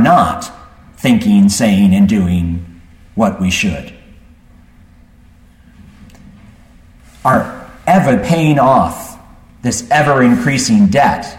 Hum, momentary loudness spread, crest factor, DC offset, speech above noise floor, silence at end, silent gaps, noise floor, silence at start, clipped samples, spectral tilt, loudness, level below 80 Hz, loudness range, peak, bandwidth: none; 15 LU; 14 dB; under 0.1%; 32 dB; 0 s; none; -43 dBFS; 0 s; under 0.1%; -5.5 dB/octave; -12 LUFS; -38 dBFS; 10 LU; 0 dBFS; 16 kHz